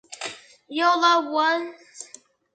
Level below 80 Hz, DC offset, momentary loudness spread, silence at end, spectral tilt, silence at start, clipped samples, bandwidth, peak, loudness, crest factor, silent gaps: -82 dBFS; under 0.1%; 22 LU; 0.5 s; -1 dB/octave; 0.1 s; under 0.1%; 9.4 kHz; -4 dBFS; -21 LUFS; 20 dB; none